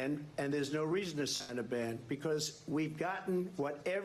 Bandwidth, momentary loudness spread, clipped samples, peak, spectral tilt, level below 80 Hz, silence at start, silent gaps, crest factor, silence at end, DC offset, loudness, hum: 13 kHz; 3 LU; under 0.1%; -24 dBFS; -4.5 dB/octave; -72 dBFS; 0 s; none; 12 dB; 0 s; under 0.1%; -37 LUFS; none